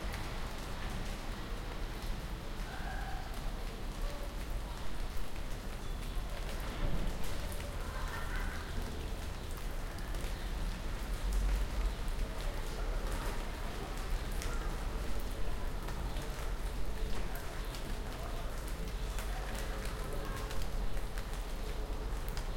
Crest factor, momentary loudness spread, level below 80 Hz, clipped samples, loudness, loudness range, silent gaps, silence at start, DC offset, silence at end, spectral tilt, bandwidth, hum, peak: 14 dB; 4 LU; -38 dBFS; under 0.1%; -42 LUFS; 3 LU; none; 0 s; under 0.1%; 0 s; -4.5 dB/octave; 17 kHz; none; -22 dBFS